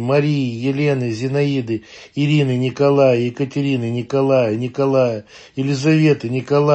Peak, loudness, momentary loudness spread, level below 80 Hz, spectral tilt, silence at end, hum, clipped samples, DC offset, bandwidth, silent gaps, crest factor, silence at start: -2 dBFS; -18 LUFS; 8 LU; -60 dBFS; -7.5 dB/octave; 0 s; none; under 0.1%; under 0.1%; 8.4 kHz; none; 14 dB; 0 s